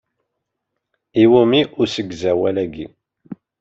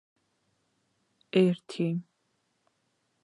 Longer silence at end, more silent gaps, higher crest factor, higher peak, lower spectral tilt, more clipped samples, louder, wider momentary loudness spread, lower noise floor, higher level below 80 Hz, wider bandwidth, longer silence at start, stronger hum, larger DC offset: second, 0.25 s vs 1.2 s; neither; second, 16 dB vs 22 dB; first, -2 dBFS vs -10 dBFS; about the same, -6.5 dB/octave vs -7.5 dB/octave; neither; first, -17 LUFS vs -29 LUFS; first, 15 LU vs 7 LU; about the same, -78 dBFS vs -76 dBFS; first, -56 dBFS vs -84 dBFS; second, 7.6 kHz vs 11 kHz; second, 1.15 s vs 1.35 s; neither; neither